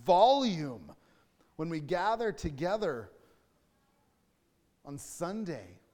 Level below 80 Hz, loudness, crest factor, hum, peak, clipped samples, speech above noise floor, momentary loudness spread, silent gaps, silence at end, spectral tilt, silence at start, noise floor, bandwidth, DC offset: -60 dBFS; -32 LUFS; 20 dB; none; -12 dBFS; under 0.1%; 42 dB; 20 LU; none; 0.2 s; -5.5 dB/octave; 0 s; -73 dBFS; 18 kHz; under 0.1%